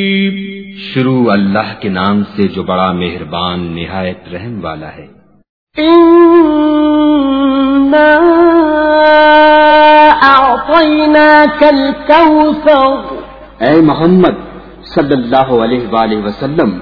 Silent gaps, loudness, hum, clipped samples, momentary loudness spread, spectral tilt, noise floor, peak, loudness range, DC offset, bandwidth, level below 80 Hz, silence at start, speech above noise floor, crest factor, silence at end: 5.49-5.67 s; -8 LUFS; none; 0.9%; 15 LU; -8.5 dB/octave; -30 dBFS; 0 dBFS; 10 LU; under 0.1%; 5.4 kHz; -38 dBFS; 0 s; 21 dB; 8 dB; 0 s